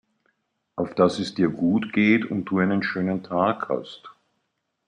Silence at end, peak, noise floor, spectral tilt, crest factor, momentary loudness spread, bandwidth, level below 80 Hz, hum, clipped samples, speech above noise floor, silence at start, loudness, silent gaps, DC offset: 0.75 s; -4 dBFS; -76 dBFS; -7 dB/octave; 20 dB; 11 LU; 10 kHz; -66 dBFS; none; under 0.1%; 53 dB; 0.75 s; -23 LUFS; none; under 0.1%